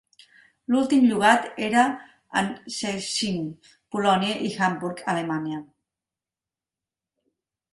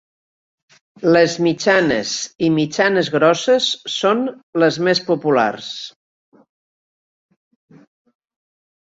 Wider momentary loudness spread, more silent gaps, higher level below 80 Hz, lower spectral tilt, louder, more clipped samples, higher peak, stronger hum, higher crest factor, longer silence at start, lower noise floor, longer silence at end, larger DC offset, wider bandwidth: first, 14 LU vs 9 LU; second, none vs 4.43-4.53 s; second, -66 dBFS vs -60 dBFS; about the same, -4.5 dB/octave vs -4.5 dB/octave; second, -24 LUFS vs -17 LUFS; neither; about the same, -2 dBFS vs -2 dBFS; neither; about the same, 22 dB vs 18 dB; second, 0.7 s vs 1 s; about the same, under -90 dBFS vs under -90 dBFS; second, 2.1 s vs 3 s; neither; first, 11.5 kHz vs 7.8 kHz